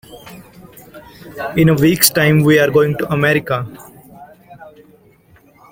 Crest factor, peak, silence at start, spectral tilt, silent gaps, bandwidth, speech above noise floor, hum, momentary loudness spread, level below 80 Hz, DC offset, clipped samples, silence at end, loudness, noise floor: 16 dB; 0 dBFS; 0.1 s; -5 dB/octave; none; 17 kHz; 36 dB; none; 21 LU; -46 dBFS; under 0.1%; under 0.1%; 1.05 s; -13 LUFS; -49 dBFS